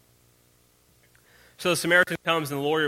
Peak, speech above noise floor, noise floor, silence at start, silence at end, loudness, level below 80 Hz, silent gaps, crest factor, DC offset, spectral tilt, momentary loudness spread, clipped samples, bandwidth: -6 dBFS; 38 dB; -62 dBFS; 1.6 s; 0 s; -23 LUFS; -66 dBFS; none; 22 dB; under 0.1%; -3.5 dB/octave; 6 LU; under 0.1%; 16.5 kHz